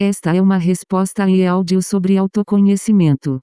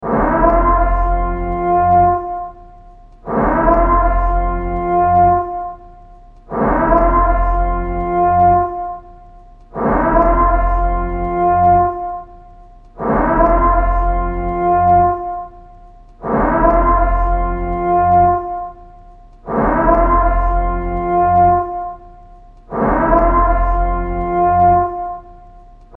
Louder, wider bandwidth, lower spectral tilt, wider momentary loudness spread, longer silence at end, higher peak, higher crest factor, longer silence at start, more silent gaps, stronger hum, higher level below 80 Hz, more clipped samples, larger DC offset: about the same, -15 LUFS vs -15 LUFS; first, 11 kHz vs 3.1 kHz; second, -7 dB/octave vs -11 dB/octave; second, 3 LU vs 14 LU; about the same, 0 s vs 0 s; second, -4 dBFS vs 0 dBFS; about the same, 10 dB vs 14 dB; about the same, 0 s vs 0 s; neither; neither; second, -54 dBFS vs -22 dBFS; neither; neither